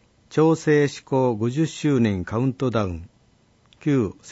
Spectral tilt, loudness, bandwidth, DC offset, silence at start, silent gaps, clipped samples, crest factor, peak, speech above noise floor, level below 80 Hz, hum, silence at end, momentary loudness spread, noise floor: -7 dB/octave; -22 LUFS; 8 kHz; under 0.1%; 0.3 s; none; under 0.1%; 14 dB; -8 dBFS; 38 dB; -52 dBFS; none; 0 s; 8 LU; -59 dBFS